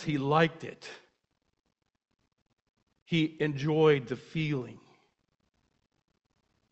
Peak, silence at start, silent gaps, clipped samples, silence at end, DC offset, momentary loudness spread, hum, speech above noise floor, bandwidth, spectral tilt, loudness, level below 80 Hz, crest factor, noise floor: -10 dBFS; 0 s; 2.42-2.46 s, 2.53-2.74 s, 2.83-2.87 s, 3.02-3.06 s; under 0.1%; 1.95 s; under 0.1%; 19 LU; none; 50 dB; 8.2 kHz; -7 dB/octave; -29 LUFS; -66 dBFS; 24 dB; -79 dBFS